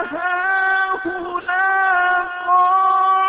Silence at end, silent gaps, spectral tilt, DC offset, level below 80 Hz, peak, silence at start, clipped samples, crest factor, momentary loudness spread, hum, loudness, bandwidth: 0 s; none; -6.5 dB/octave; under 0.1%; -58 dBFS; -6 dBFS; 0 s; under 0.1%; 12 dB; 7 LU; none; -17 LUFS; 4.8 kHz